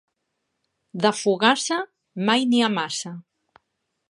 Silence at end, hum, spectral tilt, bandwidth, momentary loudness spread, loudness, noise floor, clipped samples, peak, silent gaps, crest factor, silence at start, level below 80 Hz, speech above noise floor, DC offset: 0.9 s; none; -3.5 dB/octave; 11.5 kHz; 17 LU; -22 LUFS; -77 dBFS; under 0.1%; -2 dBFS; none; 24 dB; 0.95 s; -78 dBFS; 56 dB; under 0.1%